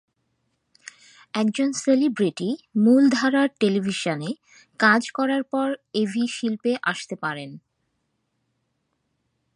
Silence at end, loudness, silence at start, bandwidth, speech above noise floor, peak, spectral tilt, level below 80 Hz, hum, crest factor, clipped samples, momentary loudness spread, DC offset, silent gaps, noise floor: 2 s; -22 LUFS; 1.35 s; 11.5 kHz; 52 dB; -4 dBFS; -5 dB/octave; -74 dBFS; none; 20 dB; under 0.1%; 11 LU; under 0.1%; none; -74 dBFS